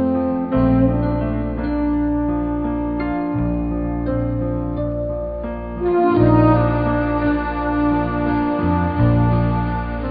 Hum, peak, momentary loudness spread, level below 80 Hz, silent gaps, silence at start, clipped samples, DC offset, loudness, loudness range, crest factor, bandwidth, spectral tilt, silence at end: none; -2 dBFS; 8 LU; -28 dBFS; none; 0 s; under 0.1%; under 0.1%; -19 LUFS; 5 LU; 16 dB; 5 kHz; -13.5 dB/octave; 0 s